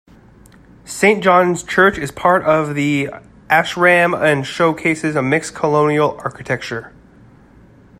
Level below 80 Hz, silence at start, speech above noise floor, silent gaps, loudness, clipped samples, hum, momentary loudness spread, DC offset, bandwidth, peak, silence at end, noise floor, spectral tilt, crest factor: -50 dBFS; 0.85 s; 30 dB; none; -15 LUFS; under 0.1%; none; 10 LU; under 0.1%; 14.5 kHz; 0 dBFS; 1.1 s; -45 dBFS; -5 dB/octave; 16 dB